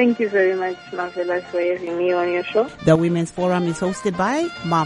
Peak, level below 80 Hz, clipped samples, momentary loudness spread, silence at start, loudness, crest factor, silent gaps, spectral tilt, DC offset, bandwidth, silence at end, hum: -2 dBFS; -54 dBFS; under 0.1%; 7 LU; 0 s; -21 LUFS; 18 dB; none; -6.5 dB/octave; under 0.1%; 11.5 kHz; 0 s; none